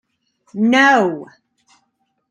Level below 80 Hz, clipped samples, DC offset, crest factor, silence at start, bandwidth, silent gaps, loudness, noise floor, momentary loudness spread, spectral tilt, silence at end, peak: -68 dBFS; under 0.1%; under 0.1%; 18 dB; 0.55 s; 10.5 kHz; none; -14 LUFS; -68 dBFS; 20 LU; -4.5 dB/octave; 1.05 s; -2 dBFS